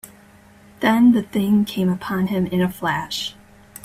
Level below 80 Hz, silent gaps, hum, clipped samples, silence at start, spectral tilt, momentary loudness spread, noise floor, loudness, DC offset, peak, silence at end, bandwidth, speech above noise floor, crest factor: -54 dBFS; none; none; under 0.1%; 0.05 s; -6 dB/octave; 9 LU; -48 dBFS; -20 LUFS; under 0.1%; -4 dBFS; 0.55 s; 16 kHz; 30 dB; 16 dB